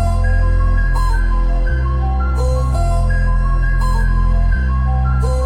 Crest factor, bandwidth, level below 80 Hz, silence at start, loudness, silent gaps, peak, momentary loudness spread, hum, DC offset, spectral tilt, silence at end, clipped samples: 8 dB; 10 kHz; -14 dBFS; 0 s; -17 LUFS; none; -6 dBFS; 2 LU; none; under 0.1%; -7 dB/octave; 0 s; under 0.1%